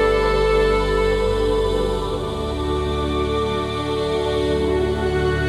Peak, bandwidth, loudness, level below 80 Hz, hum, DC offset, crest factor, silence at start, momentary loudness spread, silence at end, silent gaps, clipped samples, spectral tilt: -6 dBFS; 13 kHz; -20 LUFS; -28 dBFS; none; under 0.1%; 12 dB; 0 s; 6 LU; 0 s; none; under 0.1%; -6 dB/octave